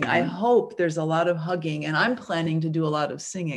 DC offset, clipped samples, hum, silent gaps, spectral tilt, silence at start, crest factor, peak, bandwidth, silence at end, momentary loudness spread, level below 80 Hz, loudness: under 0.1%; under 0.1%; none; none; -5.5 dB/octave; 0 s; 16 dB; -8 dBFS; 11 kHz; 0 s; 6 LU; -68 dBFS; -24 LUFS